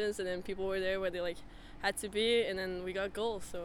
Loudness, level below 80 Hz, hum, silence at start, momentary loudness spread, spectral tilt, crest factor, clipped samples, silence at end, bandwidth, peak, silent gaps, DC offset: -35 LUFS; -56 dBFS; none; 0 s; 9 LU; -3.5 dB/octave; 18 dB; under 0.1%; 0 s; 18 kHz; -18 dBFS; none; under 0.1%